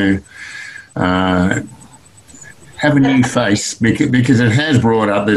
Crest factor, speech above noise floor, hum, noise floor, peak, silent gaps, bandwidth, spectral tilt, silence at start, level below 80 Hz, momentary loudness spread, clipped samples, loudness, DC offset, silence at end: 14 dB; 29 dB; none; -43 dBFS; 0 dBFS; none; 12 kHz; -5.5 dB/octave; 0 s; -40 dBFS; 17 LU; under 0.1%; -14 LUFS; 0.2%; 0 s